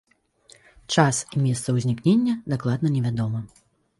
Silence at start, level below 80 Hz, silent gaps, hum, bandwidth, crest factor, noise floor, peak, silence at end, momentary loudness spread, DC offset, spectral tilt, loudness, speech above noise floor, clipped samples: 0.9 s; -58 dBFS; none; none; 11.5 kHz; 20 dB; -56 dBFS; -4 dBFS; 0.55 s; 7 LU; under 0.1%; -5.5 dB/octave; -23 LUFS; 34 dB; under 0.1%